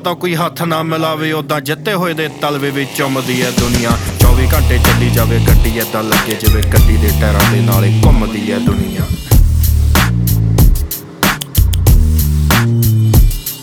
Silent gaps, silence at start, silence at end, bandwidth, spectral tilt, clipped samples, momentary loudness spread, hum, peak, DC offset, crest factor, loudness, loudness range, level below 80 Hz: none; 0 s; 0 s; over 20 kHz; -5.5 dB/octave; under 0.1%; 6 LU; none; 0 dBFS; under 0.1%; 12 dB; -13 LUFS; 4 LU; -16 dBFS